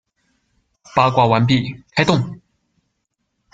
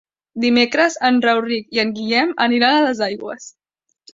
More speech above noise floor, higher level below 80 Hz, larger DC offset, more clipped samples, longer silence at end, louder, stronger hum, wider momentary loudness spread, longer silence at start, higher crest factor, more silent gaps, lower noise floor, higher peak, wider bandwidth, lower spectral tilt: first, 57 dB vs 36 dB; first, -52 dBFS vs -62 dBFS; neither; neither; first, 1.15 s vs 0.65 s; about the same, -17 LUFS vs -17 LUFS; neither; second, 8 LU vs 13 LU; first, 0.95 s vs 0.35 s; about the same, 18 dB vs 16 dB; neither; first, -73 dBFS vs -53 dBFS; about the same, -2 dBFS vs -2 dBFS; about the same, 7.8 kHz vs 7.8 kHz; first, -6.5 dB/octave vs -3.5 dB/octave